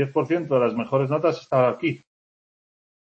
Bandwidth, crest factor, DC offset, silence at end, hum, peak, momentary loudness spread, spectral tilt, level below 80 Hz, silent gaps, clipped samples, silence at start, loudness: 7.8 kHz; 16 dB; under 0.1%; 1.15 s; none; -8 dBFS; 6 LU; -8 dB/octave; -68 dBFS; none; under 0.1%; 0 s; -23 LUFS